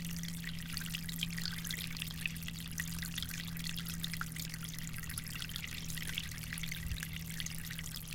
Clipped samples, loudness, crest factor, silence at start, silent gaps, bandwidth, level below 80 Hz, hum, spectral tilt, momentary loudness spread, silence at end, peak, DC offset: under 0.1%; -40 LUFS; 22 dB; 0 s; none; 17 kHz; -50 dBFS; none; -3 dB/octave; 3 LU; 0 s; -20 dBFS; under 0.1%